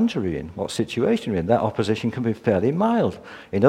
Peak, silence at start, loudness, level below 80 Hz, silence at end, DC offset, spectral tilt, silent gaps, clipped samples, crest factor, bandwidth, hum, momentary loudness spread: -2 dBFS; 0 s; -23 LUFS; -50 dBFS; 0 s; under 0.1%; -7 dB/octave; none; under 0.1%; 20 dB; 12.5 kHz; none; 8 LU